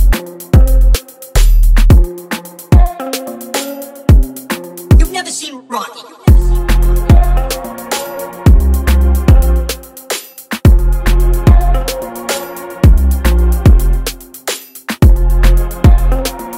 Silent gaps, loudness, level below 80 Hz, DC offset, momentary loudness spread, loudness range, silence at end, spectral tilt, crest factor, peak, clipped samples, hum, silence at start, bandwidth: none; -13 LUFS; -10 dBFS; under 0.1%; 12 LU; 2 LU; 0 s; -6 dB/octave; 10 dB; 0 dBFS; under 0.1%; none; 0 s; 16.5 kHz